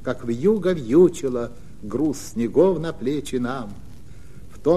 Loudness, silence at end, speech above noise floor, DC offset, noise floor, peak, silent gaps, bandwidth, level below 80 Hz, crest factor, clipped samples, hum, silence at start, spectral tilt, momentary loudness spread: -22 LUFS; 0 s; 22 dB; 2%; -43 dBFS; -4 dBFS; none; 14 kHz; -46 dBFS; 16 dB; under 0.1%; none; 0 s; -7 dB/octave; 14 LU